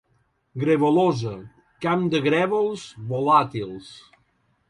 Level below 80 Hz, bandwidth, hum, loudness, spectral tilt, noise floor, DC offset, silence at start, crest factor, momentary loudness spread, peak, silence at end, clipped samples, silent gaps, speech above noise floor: -62 dBFS; 11 kHz; none; -22 LUFS; -7 dB/octave; -67 dBFS; under 0.1%; 0.55 s; 18 dB; 16 LU; -4 dBFS; 0.7 s; under 0.1%; none; 45 dB